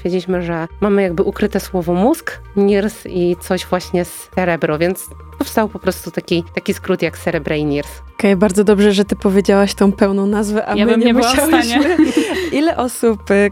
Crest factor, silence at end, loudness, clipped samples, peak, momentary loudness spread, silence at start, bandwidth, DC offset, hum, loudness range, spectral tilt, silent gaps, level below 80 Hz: 16 dB; 0 s; -16 LUFS; under 0.1%; 0 dBFS; 9 LU; 0 s; 17.5 kHz; under 0.1%; none; 6 LU; -5.5 dB/octave; none; -38 dBFS